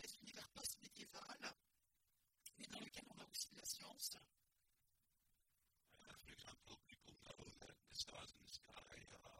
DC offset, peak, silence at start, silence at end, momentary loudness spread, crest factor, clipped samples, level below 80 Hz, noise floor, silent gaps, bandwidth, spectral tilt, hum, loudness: under 0.1%; -30 dBFS; 0 s; 0 s; 13 LU; 28 dB; under 0.1%; -80 dBFS; -86 dBFS; none; 16.5 kHz; -1 dB/octave; none; -55 LUFS